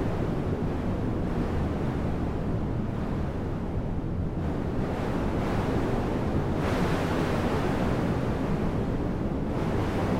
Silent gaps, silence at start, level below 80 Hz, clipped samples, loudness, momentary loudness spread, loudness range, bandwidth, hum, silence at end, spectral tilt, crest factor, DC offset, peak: none; 0 s; -34 dBFS; under 0.1%; -29 LUFS; 4 LU; 3 LU; 16 kHz; none; 0 s; -8 dB/octave; 12 dB; 0.2%; -14 dBFS